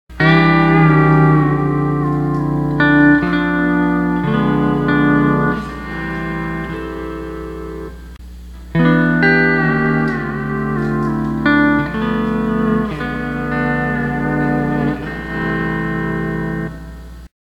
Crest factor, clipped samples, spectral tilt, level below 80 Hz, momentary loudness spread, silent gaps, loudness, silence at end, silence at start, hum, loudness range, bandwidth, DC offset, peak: 16 dB; under 0.1%; -8.5 dB/octave; -34 dBFS; 15 LU; none; -16 LUFS; 0.25 s; 0.1 s; none; 7 LU; 8 kHz; under 0.1%; 0 dBFS